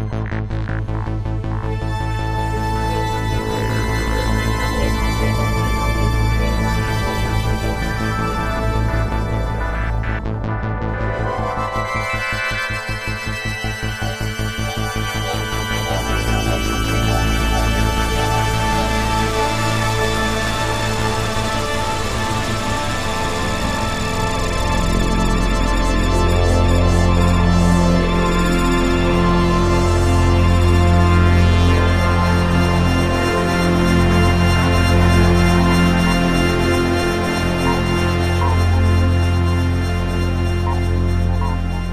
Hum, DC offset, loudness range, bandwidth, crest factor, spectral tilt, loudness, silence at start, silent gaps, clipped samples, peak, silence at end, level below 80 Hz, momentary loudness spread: none; under 0.1%; 7 LU; 15.5 kHz; 16 dB; -5.5 dB/octave; -18 LUFS; 0 s; none; under 0.1%; -2 dBFS; 0 s; -22 dBFS; 8 LU